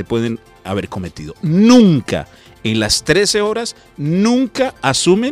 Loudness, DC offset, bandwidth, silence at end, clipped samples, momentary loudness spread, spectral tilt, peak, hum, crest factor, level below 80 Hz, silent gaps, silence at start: -15 LUFS; under 0.1%; 16 kHz; 0 s; under 0.1%; 15 LU; -5 dB/octave; 0 dBFS; none; 14 dB; -44 dBFS; none; 0 s